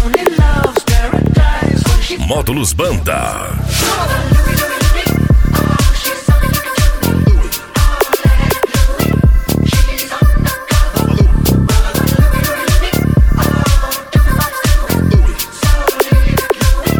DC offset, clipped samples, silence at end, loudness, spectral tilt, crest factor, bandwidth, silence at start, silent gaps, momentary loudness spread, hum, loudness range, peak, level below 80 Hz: under 0.1%; under 0.1%; 0 s; -13 LUFS; -5 dB/octave; 10 dB; 19.5 kHz; 0 s; none; 4 LU; none; 1 LU; 0 dBFS; -14 dBFS